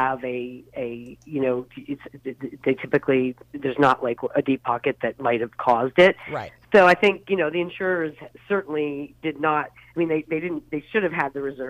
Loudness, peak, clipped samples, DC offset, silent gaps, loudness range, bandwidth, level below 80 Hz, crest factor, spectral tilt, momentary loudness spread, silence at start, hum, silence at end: -23 LUFS; -6 dBFS; under 0.1%; under 0.1%; none; 6 LU; 12 kHz; -60 dBFS; 18 dB; -6.5 dB/octave; 15 LU; 0 s; none; 0 s